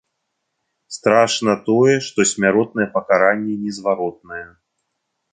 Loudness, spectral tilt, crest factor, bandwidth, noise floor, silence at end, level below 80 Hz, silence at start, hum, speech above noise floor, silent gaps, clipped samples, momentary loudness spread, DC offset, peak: -17 LUFS; -4 dB/octave; 18 dB; 9.6 kHz; -75 dBFS; 0.85 s; -60 dBFS; 0.9 s; none; 57 dB; none; under 0.1%; 13 LU; under 0.1%; -2 dBFS